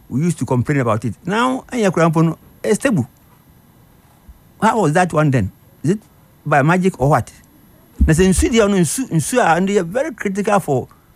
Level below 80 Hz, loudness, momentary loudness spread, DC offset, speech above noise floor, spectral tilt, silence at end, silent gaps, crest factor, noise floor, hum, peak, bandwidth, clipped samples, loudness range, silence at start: -32 dBFS; -17 LUFS; 8 LU; under 0.1%; 33 dB; -6 dB/octave; 0.3 s; none; 14 dB; -49 dBFS; none; -2 dBFS; 15.5 kHz; under 0.1%; 4 LU; 0.1 s